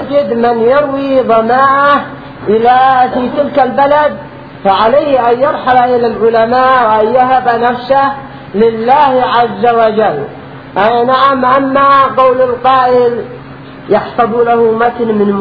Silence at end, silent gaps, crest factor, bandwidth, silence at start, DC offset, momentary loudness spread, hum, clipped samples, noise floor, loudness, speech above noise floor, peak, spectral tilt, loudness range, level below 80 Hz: 0 s; none; 10 dB; 5.4 kHz; 0 s; 0.3%; 9 LU; none; 0.3%; -29 dBFS; -9 LUFS; 20 dB; 0 dBFS; -8 dB/octave; 1 LU; -44 dBFS